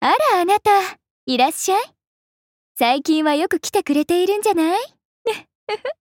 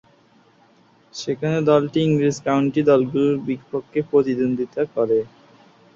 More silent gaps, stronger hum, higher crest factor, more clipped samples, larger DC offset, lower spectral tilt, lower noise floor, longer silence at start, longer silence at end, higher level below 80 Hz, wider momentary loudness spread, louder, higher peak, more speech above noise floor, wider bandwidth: first, 1.10-1.27 s, 2.07-2.75 s, 5.05-5.25 s, 5.55-5.67 s vs none; neither; about the same, 14 dB vs 18 dB; neither; neither; second, -2.5 dB/octave vs -7 dB/octave; first, under -90 dBFS vs -55 dBFS; second, 0 s vs 1.15 s; second, 0.1 s vs 0.7 s; about the same, -64 dBFS vs -60 dBFS; first, 13 LU vs 10 LU; about the same, -19 LUFS vs -20 LUFS; about the same, -6 dBFS vs -4 dBFS; first, over 72 dB vs 36 dB; first, 17 kHz vs 7.6 kHz